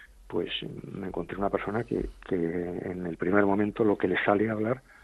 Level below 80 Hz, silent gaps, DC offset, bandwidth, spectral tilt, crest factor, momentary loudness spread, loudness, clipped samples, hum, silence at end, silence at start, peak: -52 dBFS; none; under 0.1%; 12 kHz; -8 dB/octave; 20 dB; 10 LU; -29 LUFS; under 0.1%; none; 0.25 s; 0 s; -10 dBFS